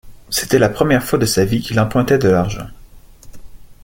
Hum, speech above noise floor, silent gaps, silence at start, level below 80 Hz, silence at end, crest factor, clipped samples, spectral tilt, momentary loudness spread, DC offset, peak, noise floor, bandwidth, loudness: none; 25 dB; none; 0.05 s; -38 dBFS; 0.1 s; 16 dB; under 0.1%; -5 dB/octave; 9 LU; under 0.1%; 0 dBFS; -40 dBFS; 17 kHz; -16 LUFS